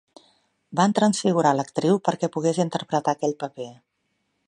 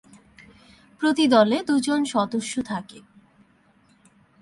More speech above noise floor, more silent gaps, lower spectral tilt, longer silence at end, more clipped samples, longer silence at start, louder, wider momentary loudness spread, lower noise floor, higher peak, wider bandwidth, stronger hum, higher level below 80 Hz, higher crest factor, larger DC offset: first, 51 dB vs 38 dB; neither; about the same, -5.5 dB/octave vs -4.5 dB/octave; second, 0.75 s vs 1.4 s; neither; second, 0.7 s vs 1 s; about the same, -23 LUFS vs -22 LUFS; about the same, 12 LU vs 14 LU; first, -74 dBFS vs -59 dBFS; about the same, -4 dBFS vs -4 dBFS; about the same, 11.5 kHz vs 11.5 kHz; neither; about the same, -70 dBFS vs -66 dBFS; about the same, 20 dB vs 20 dB; neither